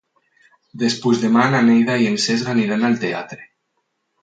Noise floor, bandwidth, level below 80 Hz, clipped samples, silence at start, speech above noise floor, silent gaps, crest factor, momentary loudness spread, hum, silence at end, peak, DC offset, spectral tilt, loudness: -72 dBFS; 9.2 kHz; -64 dBFS; under 0.1%; 0.75 s; 55 dB; none; 16 dB; 11 LU; none; 0.8 s; -2 dBFS; under 0.1%; -5 dB/octave; -17 LUFS